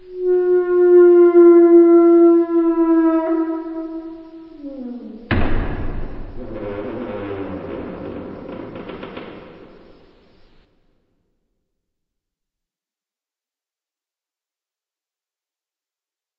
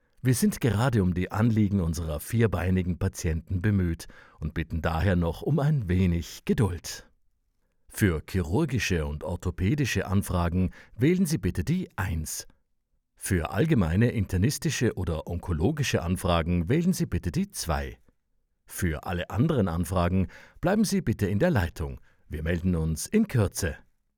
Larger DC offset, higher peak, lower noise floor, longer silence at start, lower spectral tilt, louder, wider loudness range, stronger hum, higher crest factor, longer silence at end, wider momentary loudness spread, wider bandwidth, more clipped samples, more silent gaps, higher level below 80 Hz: neither; first, -2 dBFS vs -8 dBFS; first, under -90 dBFS vs -73 dBFS; second, 0.1 s vs 0.25 s; first, -7.5 dB/octave vs -6 dB/octave; first, -13 LUFS vs -27 LUFS; first, 23 LU vs 3 LU; neither; about the same, 16 dB vs 18 dB; first, 7 s vs 0.4 s; first, 24 LU vs 9 LU; second, 4 kHz vs 19.5 kHz; neither; neither; first, -34 dBFS vs -44 dBFS